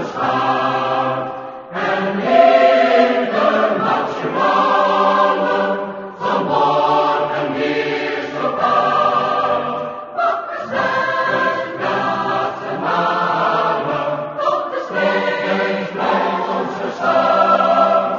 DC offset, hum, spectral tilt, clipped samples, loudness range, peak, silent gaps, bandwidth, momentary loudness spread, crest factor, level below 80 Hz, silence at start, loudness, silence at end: under 0.1%; none; -5.5 dB/octave; under 0.1%; 4 LU; 0 dBFS; none; 7.2 kHz; 9 LU; 16 dB; -60 dBFS; 0 s; -17 LUFS; 0 s